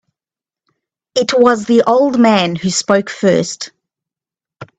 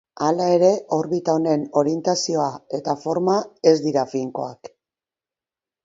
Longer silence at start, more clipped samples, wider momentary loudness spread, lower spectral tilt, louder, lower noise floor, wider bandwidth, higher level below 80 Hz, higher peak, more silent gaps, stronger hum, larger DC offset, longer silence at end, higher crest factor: first, 1.15 s vs 0.15 s; neither; about the same, 10 LU vs 9 LU; about the same, -4.5 dB/octave vs -5.5 dB/octave; first, -13 LUFS vs -21 LUFS; about the same, -90 dBFS vs under -90 dBFS; first, 9.2 kHz vs 7.8 kHz; first, -56 dBFS vs -68 dBFS; about the same, 0 dBFS vs -2 dBFS; neither; neither; neither; second, 0.15 s vs 1.15 s; about the same, 16 dB vs 20 dB